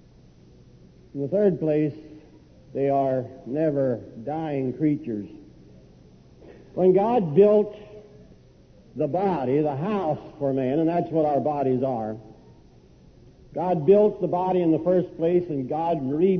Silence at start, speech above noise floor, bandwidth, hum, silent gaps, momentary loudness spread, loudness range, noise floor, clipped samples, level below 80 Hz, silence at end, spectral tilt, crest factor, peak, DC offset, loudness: 1.15 s; 30 dB; 6.2 kHz; none; none; 14 LU; 4 LU; -52 dBFS; under 0.1%; -58 dBFS; 0 s; -10.5 dB/octave; 18 dB; -6 dBFS; under 0.1%; -24 LUFS